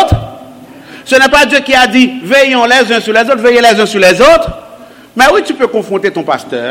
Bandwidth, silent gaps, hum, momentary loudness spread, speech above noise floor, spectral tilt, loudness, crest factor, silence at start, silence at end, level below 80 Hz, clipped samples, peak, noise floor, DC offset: 17 kHz; none; none; 10 LU; 26 dB; -4 dB/octave; -8 LUFS; 8 dB; 0 s; 0 s; -32 dBFS; 1%; 0 dBFS; -34 dBFS; under 0.1%